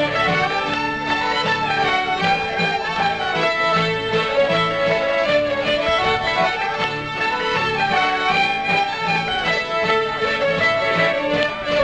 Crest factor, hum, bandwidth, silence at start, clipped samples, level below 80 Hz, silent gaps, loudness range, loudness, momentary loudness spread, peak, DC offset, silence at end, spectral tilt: 18 dB; none; 9.4 kHz; 0 s; under 0.1%; -46 dBFS; none; 1 LU; -19 LUFS; 3 LU; -2 dBFS; 0.2%; 0 s; -4.5 dB/octave